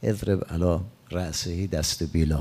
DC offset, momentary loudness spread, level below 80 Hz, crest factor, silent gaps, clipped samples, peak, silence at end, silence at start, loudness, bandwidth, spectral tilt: under 0.1%; 5 LU; -40 dBFS; 18 dB; none; under 0.1%; -8 dBFS; 0 s; 0 s; -27 LUFS; 16 kHz; -5.5 dB/octave